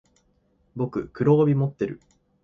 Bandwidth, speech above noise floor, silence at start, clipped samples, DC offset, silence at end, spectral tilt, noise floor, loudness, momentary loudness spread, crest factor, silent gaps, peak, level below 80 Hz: 6.8 kHz; 43 dB; 0.75 s; under 0.1%; under 0.1%; 0.5 s; -10.5 dB/octave; -65 dBFS; -24 LUFS; 18 LU; 16 dB; none; -8 dBFS; -58 dBFS